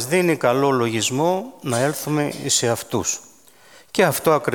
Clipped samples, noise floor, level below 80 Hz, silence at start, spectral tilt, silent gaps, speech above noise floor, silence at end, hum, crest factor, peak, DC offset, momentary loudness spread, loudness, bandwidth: under 0.1%; -50 dBFS; -60 dBFS; 0 s; -4 dB/octave; none; 30 dB; 0 s; none; 18 dB; -4 dBFS; 0.1%; 7 LU; -20 LUFS; 19 kHz